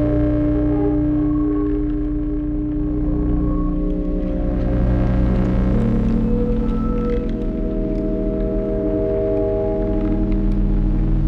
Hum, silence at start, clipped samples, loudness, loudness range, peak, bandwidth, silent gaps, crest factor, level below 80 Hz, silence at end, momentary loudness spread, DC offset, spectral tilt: none; 0 s; under 0.1%; -20 LUFS; 2 LU; -6 dBFS; 4.5 kHz; none; 12 dB; -22 dBFS; 0 s; 4 LU; under 0.1%; -11 dB/octave